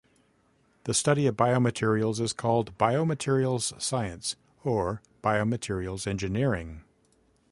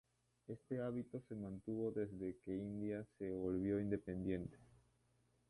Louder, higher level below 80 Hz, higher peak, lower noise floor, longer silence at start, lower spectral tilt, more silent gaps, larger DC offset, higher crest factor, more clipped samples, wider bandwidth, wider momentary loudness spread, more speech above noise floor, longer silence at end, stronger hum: first, -28 LUFS vs -45 LUFS; first, -52 dBFS vs -68 dBFS; first, -8 dBFS vs -28 dBFS; second, -66 dBFS vs -78 dBFS; first, 0.85 s vs 0.5 s; second, -5 dB/octave vs -9.5 dB/octave; neither; neither; about the same, 20 dB vs 18 dB; neither; about the same, 11.5 kHz vs 11.5 kHz; about the same, 9 LU vs 9 LU; first, 40 dB vs 34 dB; second, 0.7 s vs 0.85 s; second, none vs 60 Hz at -70 dBFS